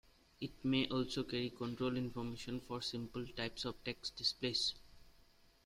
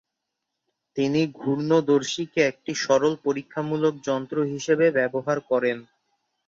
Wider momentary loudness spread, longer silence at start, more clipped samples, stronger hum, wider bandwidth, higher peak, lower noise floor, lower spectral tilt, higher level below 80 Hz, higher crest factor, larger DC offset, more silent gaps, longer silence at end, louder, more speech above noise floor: about the same, 9 LU vs 8 LU; second, 0.4 s vs 0.95 s; neither; neither; first, 15.5 kHz vs 7.8 kHz; second, -20 dBFS vs -6 dBFS; second, -67 dBFS vs -82 dBFS; about the same, -4.5 dB/octave vs -5 dB/octave; about the same, -64 dBFS vs -68 dBFS; about the same, 20 dB vs 18 dB; neither; neither; about the same, 0.55 s vs 0.65 s; second, -40 LUFS vs -24 LUFS; second, 27 dB vs 59 dB